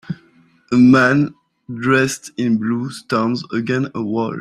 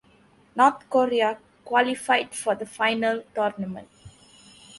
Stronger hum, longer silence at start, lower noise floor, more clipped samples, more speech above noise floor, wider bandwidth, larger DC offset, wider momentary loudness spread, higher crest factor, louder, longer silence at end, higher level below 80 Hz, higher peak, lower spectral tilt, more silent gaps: neither; second, 0.1 s vs 0.55 s; second, -53 dBFS vs -58 dBFS; neither; about the same, 37 dB vs 34 dB; first, 13.5 kHz vs 11.5 kHz; neither; about the same, 12 LU vs 14 LU; about the same, 16 dB vs 20 dB; first, -17 LUFS vs -24 LUFS; about the same, 0 s vs 0 s; first, -56 dBFS vs -66 dBFS; first, -2 dBFS vs -6 dBFS; first, -6 dB/octave vs -3.5 dB/octave; neither